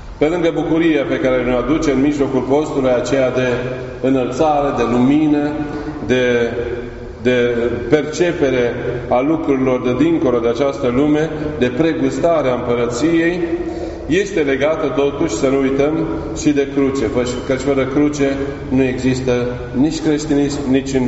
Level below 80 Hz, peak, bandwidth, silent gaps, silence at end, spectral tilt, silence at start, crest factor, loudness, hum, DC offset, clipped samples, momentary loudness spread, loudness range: -36 dBFS; 0 dBFS; 8 kHz; none; 0 s; -5.5 dB/octave; 0 s; 16 dB; -16 LUFS; none; under 0.1%; under 0.1%; 6 LU; 1 LU